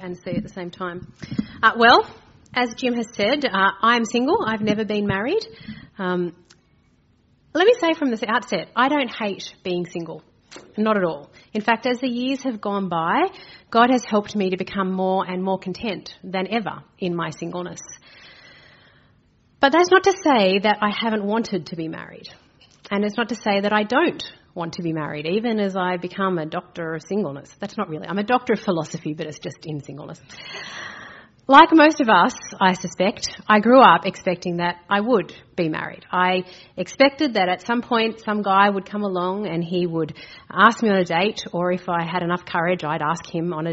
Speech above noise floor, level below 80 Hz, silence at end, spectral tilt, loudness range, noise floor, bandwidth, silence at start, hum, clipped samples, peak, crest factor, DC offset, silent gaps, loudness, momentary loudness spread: 39 dB; -60 dBFS; 0 s; -3 dB/octave; 8 LU; -60 dBFS; 8 kHz; 0 s; none; under 0.1%; 0 dBFS; 20 dB; under 0.1%; none; -20 LUFS; 16 LU